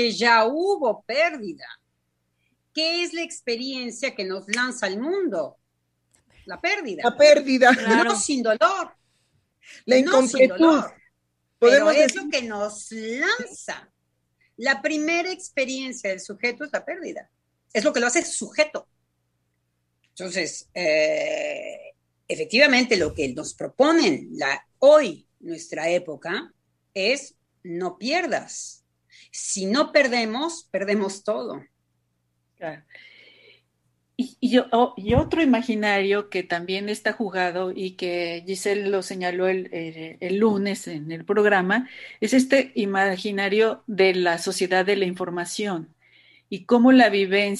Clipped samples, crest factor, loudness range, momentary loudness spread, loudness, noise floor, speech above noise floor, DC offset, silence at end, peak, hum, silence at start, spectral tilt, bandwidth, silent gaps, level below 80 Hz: under 0.1%; 20 dB; 8 LU; 17 LU; -22 LUFS; -74 dBFS; 52 dB; under 0.1%; 0 s; -2 dBFS; 60 Hz at -65 dBFS; 0 s; -3.5 dB/octave; 12.5 kHz; none; -54 dBFS